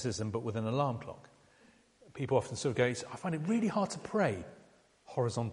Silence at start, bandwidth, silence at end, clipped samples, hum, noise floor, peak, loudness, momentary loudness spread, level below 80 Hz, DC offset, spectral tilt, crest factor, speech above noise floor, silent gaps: 0 s; 11.5 kHz; 0 s; under 0.1%; none; -64 dBFS; -14 dBFS; -34 LUFS; 12 LU; -66 dBFS; under 0.1%; -6 dB/octave; 20 dB; 31 dB; none